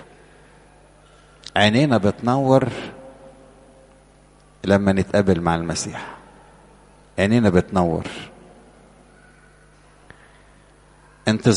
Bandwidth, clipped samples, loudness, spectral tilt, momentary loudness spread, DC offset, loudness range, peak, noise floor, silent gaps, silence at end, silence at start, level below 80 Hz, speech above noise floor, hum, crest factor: 11.5 kHz; under 0.1%; -20 LUFS; -6 dB/octave; 20 LU; under 0.1%; 5 LU; 0 dBFS; -51 dBFS; none; 0 s; 1.55 s; -48 dBFS; 33 dB; 50 Hz at -50 dBFS; 22 dB